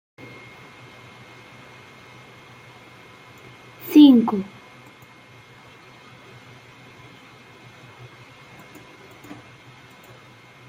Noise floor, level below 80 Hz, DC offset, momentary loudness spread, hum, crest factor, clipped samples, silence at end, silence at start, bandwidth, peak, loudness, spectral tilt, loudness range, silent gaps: -48 dBFS; -68 dBFS; under 0.1%; 28 LU; none; 22 dB; under 0.1%; 6.25 s; 3.85 s; 16 kHz; -2 dBFS; -15 LUFS; -6 dB/octave; 24 LU; none